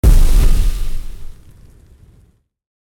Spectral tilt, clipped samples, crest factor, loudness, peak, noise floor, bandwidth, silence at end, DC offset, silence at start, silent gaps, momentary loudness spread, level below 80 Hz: -5.5 dB/octave; under 0.1%; 12 dB; -18 LUFS; -2 dBFS; -53 dBFS; 16.5 kHz; 1.6 s; under 0.1%; 0.05 s; none; 24 LU; -14 dBFS